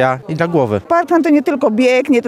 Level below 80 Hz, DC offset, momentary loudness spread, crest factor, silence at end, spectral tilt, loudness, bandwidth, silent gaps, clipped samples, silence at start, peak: -56 dBFS; under 0.1%; 4 LU; 12 dB; 0 s; -6.5 dB/octave; -14 LUFS; 13.5 kHz; none; under 0.1%; 0 s; -2 dBFS